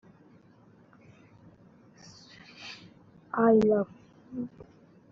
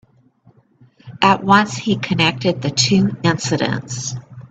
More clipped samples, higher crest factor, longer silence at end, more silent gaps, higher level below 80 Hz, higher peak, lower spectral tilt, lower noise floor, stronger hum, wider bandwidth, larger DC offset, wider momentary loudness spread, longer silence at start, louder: neither; about the same, 20 dB vs 18 dB; first, 0.65 s vs 0.05 s; neither; second, -66 dBFS vs -52 dBFS; second, -12 dBFS vs 0 dBFS; first, -6 dB/octave vs -4.5 dB/octave; first, -58 dBFS vs -53 dBFS; neither; second, 7.4 kHz vs 9 kHz; neither; first, 28 LU vs 11 LU; first, 2.6 s vs 1.05 s; second, -27 LUFS vs -17 LUFS